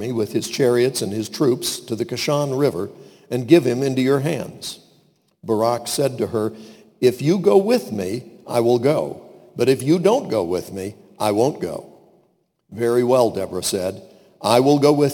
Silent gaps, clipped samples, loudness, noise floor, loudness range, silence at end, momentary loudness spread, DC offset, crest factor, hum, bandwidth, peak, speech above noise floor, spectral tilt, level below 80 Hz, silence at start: none; under 0.1%; -20 LUFS; -63 dBFS; 3 LU; 0 s; 15 LU; under 0.1%; 20 dB; none; 19 kHz; 0 dBFS; 44 dB; -5.5 dB/octave; -62 dBFS; 0 s